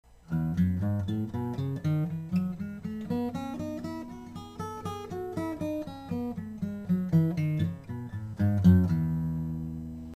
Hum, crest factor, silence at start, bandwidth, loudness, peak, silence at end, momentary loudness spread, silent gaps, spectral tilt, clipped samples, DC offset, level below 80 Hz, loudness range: none; 20 dB; 0.3 s; 13.5 kHz; -31 LUFS; -8 dBFS; 0 s; 13 LU; none; -9 dB/octave; under 0.1%; under 0.1%; -50 dBFS; 8 LU